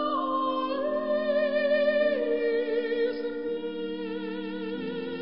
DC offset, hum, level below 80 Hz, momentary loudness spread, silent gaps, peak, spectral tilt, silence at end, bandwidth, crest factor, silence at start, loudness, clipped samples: 0.3%; none; -66 dBFS; 9 LU; none; -14 dBFS; -9 dB/octave; 0 s; 5.6 kHz; 14 dB; 0 s; -28 LUFS; under 0.1%